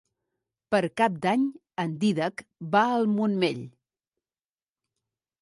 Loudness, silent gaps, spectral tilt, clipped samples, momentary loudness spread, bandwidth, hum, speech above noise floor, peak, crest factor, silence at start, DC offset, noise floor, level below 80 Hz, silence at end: -26 LUFS; none; -6.5 dB/octave; under 0.1%; 9 LU; 11.5 kHz; none; over 65 dB; -10 dBFS; 18 dB; 0.7 s; under 0.1%; under -90 dBFS; -72 dBFS; 1.7 s